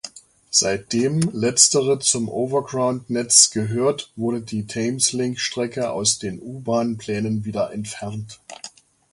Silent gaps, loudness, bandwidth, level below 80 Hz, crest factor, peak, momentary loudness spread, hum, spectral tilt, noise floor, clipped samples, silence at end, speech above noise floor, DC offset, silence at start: none; -20 LUFS; 11.5 kHz; -58 dBFS; 22 dB; 0 dBFS; 17 LU; none; -3 dB/octave; -41 dBFS; under 0.1%; 0.45 s; 19 dB; under 0.1%; 0.05 s